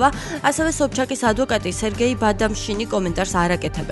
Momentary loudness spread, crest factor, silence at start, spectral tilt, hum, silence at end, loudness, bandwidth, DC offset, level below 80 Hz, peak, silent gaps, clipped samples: 3 LU; 18 dB; 0 s; -4.5 dB/octave; none; 0 s; -21 LUFS; 12 kHz; under 0.1%; -34 dBFS; -2 dBFS; none; under 0.1%